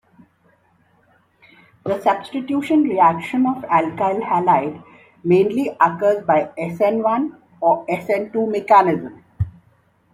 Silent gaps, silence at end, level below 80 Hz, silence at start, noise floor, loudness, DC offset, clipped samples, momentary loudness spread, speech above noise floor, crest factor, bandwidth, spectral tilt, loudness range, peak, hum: none; 0.65 s; -52 dBFS; 1.85 s; -59 dBFS; -19 LUFS; under 0.1%; under 0.1%; 14 LU; 41 dB; 18 dB; 15 kHz; -7.5 dB/octave; 2 LU; -2 dBFS; none